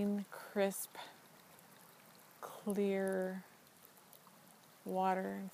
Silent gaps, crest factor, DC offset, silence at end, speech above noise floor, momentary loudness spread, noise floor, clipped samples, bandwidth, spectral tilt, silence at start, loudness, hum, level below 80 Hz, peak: none; 18 dB; under 0.1%; 0 s; 25 dB; 24 LU; -63 dBFS; under 0.1%; 15.5 kHz; -5.5 dB/octave; 0 s; -39 LUFS; none; -88 dBFS; -22 dBFS